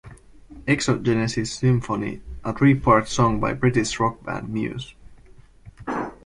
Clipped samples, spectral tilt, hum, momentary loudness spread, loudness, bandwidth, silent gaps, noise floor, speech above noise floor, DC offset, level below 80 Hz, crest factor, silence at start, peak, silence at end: under 0.1%; -6 dB/octave; none; 13 LU; -22 LUFS; 11.5 kHz; none; -48 dBFS; 27 dB; under 0.1%; -44 dBFS; 18 dB; 0.05 s; -4 dBFS; 0.1 s